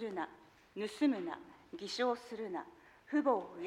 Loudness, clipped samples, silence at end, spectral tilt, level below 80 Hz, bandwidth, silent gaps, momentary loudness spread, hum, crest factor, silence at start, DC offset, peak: -38 LUFS; under 0.1%; 0 s; -4.5 dB/octave; -78 dBFS; 12 kHz; none; 16 LU; none; 20 dB; 0 s; under 0.1%; -20 dBFS